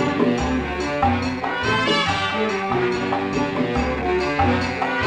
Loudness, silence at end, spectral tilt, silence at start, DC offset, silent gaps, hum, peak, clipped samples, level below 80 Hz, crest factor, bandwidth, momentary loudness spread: -21 LUFS; 0 s; -5.5 dB/octave; 0 s; under 0.1%; none; none; -6 dBFS; under 0.1%; -38 dBFS; 16 dB; 10 kHz; 4 LU